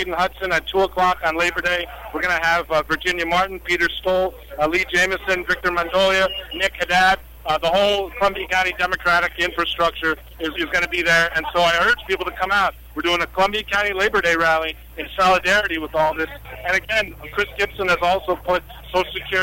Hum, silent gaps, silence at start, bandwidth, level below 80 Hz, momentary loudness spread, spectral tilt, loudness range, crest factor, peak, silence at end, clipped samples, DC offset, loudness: none; none; 0 s; 16.5 kHz; -42 dBFS; 8 LU; -3 dB/octave; 2 LU; 14 dB; -6 dBFS; 0 s; under 0.1%; under 0.1%; -19 LUFS